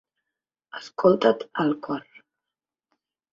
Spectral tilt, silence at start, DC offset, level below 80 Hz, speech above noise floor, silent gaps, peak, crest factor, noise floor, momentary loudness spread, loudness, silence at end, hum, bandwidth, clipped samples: -7 dB/octave; 0.75 s; under 0.1%; -70 dBFS; 66 dB; none; -4 dBFS; 22 dB; -89 dBFS; 19 LU; -23 LUFS; 1.3 s; none; 7.6 kHz; under 0.1%